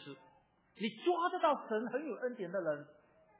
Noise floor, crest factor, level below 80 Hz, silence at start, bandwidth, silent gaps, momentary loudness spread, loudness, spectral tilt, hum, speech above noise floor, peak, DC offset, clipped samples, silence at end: -69 dBFS; 20 dB; -90 dBFS; 0 s; 4 kHz; none; 11 LU; -37 LUFS; -3.5 dB/octave; none; 33 dB; -20 dBFS; under 0.1%; under 0.1%; 0.5 s